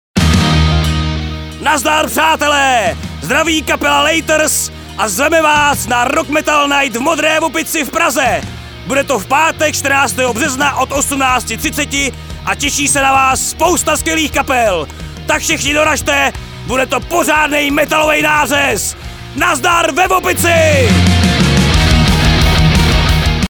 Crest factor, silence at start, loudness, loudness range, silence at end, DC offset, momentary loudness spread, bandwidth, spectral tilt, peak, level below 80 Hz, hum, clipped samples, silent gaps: 12 dB; 0.15 s; -12 LUFS; 3 LU; 0.05 s; under 0.1%; 7 LU; over 20 kHz; -3.5 dB/octave; 0 dBFS; -24 dBFS; none; under 0.1%; none